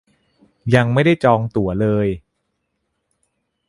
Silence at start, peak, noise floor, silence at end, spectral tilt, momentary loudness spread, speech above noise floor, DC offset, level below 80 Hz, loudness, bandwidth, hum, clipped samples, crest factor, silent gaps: 0.65 s; 0 dBFS; -73 dBFS; 1.5 s; -8 dB/octave; 10 LU; 57 dB; under 0.1%; -46 dBFS; -17 LUFS; 11.5 kHz; none; under 0.1%; 20 dB; none